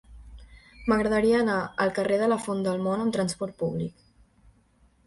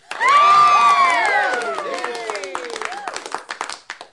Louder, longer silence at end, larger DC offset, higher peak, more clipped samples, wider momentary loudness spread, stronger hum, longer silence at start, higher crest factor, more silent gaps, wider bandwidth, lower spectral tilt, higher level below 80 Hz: second, -26 LUFS vs -15 LUFS; first, 1.15 s vs 0.1 s; neither; second, -10 dBFS vs -4 dBFS; neither; second, 8 LU vs 18 LU; neither; about the same, 0.1 s vs 0.1 s; about the same, 18 dB vs 14 dB; neither; about the same, 11.5 kHz vs 11.5 kHz; first, -6 dB/octave vs -0.5 dB/octave; first, -52 dBFS vs -64 dBFS